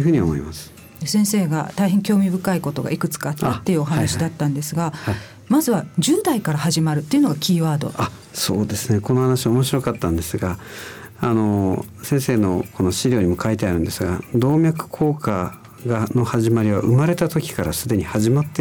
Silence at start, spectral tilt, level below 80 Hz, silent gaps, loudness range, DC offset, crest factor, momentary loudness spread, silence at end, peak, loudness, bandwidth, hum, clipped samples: 0 s; -6 dB/octave; -44 dBFS; none; 2 LU; under 0.1%; 12 dB; 8 LU; 0 s; -8 dBFS; -20 LUFS; over 20 kHz; none; under 0.1%